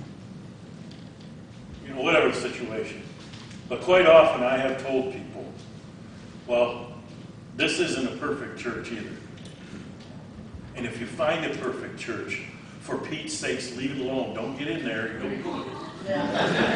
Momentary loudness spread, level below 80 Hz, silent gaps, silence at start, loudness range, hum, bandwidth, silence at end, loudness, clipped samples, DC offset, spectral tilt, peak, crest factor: 21 LU; -58 dBFS; none; 0 s; 10 LU; none; 10.5 kHz; 0 s; -26 LUFS; under 0.1%; under 0.1%; -4.5 dB/octave; -2 dBFS; 24 dB